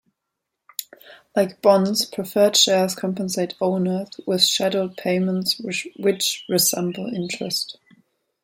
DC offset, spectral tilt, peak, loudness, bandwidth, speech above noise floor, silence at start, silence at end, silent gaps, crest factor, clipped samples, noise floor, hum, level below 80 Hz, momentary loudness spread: under 0.1%; -3.5 dB/octave; -2 dBFS; -21 LUFS; 16.5 kHz; 60 dB; 0.8 s; 0.7 s; none; 20 dB; under 0.1%; -81 dBFS; none; -68 dBFS; 11 LU